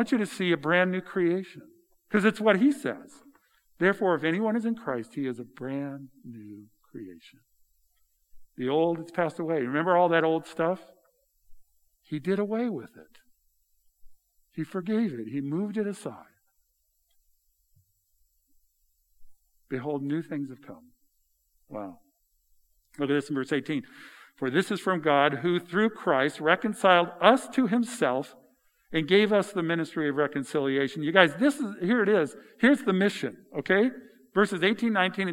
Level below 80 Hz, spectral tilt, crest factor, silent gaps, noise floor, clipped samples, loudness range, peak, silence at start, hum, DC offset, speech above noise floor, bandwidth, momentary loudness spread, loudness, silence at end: -70 dBFS; -6 dB/octave; 26 dB; none; -73 dBFS; under 0.1%; 13 LU; -2 dBFS; 0 s; none; under 0.1%; 46 dB; 16 kHz; 16 LU; -26 LUFS; 0 s